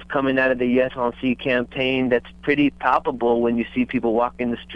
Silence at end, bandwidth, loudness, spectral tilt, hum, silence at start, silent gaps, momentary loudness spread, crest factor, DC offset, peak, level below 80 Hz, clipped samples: 0 s; 5.6 kHz; -21 LUFS; -7.5 dB/octave; none; 0 s; none; 4 LU; 18 dB; under 0.1%; -4 dBFS; -48 dBFS; under 0.1%